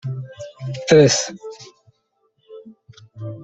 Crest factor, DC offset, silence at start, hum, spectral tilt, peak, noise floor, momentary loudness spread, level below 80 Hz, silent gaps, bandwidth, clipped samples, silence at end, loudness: 20 dB; under 0.1%; 0.05 s; none; -4.5 dB/octave; -2 dBFS; -67 dBFS; 24 LU; -58 dBFS; none; 8.4 kHz; under 0.1%; 0 s; -17 LUFS